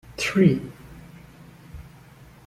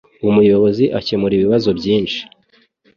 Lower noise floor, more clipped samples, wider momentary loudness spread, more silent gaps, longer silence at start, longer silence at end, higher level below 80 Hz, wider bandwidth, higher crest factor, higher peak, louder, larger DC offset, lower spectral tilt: second, -48 dBFS vs -56 dBFS; neither; first, 26 LU vs 6 LU; neither; about the same, 0.1 s vs 0.2 s; about the same, 0.65 s vs 0.75 s; about the same, -50 dBFS vs -48 dBFS; first, 14 kHz vs 7 kHz; first, 22 dB vs 14 dB; about the same, -4 dBFS vs -2 dBFS; second, -21 LUFS vs -15 LUFS; neither; second, -6 dB/octave vs -7.5 dB/octave